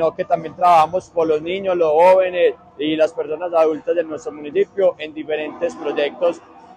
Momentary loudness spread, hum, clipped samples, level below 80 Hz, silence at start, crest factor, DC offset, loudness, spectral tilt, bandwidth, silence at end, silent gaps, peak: 11 LU; none; under 0.1%; -60 dBFS; 0 s; 14 dB; under 0.1%; -18 LUFS; -5.5 dB/octave; 10.5 kHz; 0.4 s; none; -4 dBFS